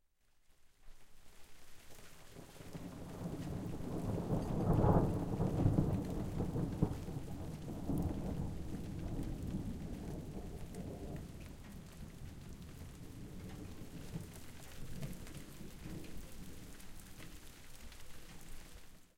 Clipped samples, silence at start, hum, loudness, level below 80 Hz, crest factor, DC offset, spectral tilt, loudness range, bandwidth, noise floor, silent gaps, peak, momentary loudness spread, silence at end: under 0.1%; 0.5 s; none; -41 LUFS; -50 dBFS; 24 dB; under 0.1%; -7.5 dB/octave; 15 LU; 16.5 kHz; -69 dBFS; none; -16 dBFS; 20 LU; 0.1 s